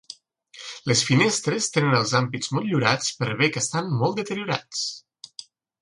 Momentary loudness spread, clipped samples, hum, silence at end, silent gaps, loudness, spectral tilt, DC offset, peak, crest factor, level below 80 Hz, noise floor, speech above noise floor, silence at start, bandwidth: 21 LU; under 0.1%; none; 0.4 s; none; -23 LUFS; -4 dB/octave; under 0.1%; -4 dBFS; 22 dB; -64 dBFS; -49 dBFS; 26 dB; 0.1 s; 11.5 kHz